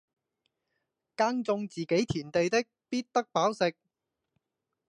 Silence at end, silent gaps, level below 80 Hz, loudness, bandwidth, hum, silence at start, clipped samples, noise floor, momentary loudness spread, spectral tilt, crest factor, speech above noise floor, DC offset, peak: 1.2 s; none; -64 dBFS; -30 LUFS; 10.5 kHz; none; 1.2 s; under 0.1%; -85 dBFS; 6 LU; -5 dB/octave; 20 dB; 56 dB; under 0.1%; -12 dBFS